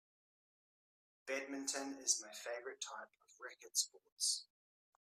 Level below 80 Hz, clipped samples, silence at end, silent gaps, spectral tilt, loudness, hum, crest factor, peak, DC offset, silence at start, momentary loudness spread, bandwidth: under -90 dBFS; under 0.1%; 0.6 s; 4.12-4.17 s; 1.5 dB/octave; -41 LUFS; none; 26 dB; -20 dBFS; under 0.1%; 1.25 s; 17 LU; 15.5 kHz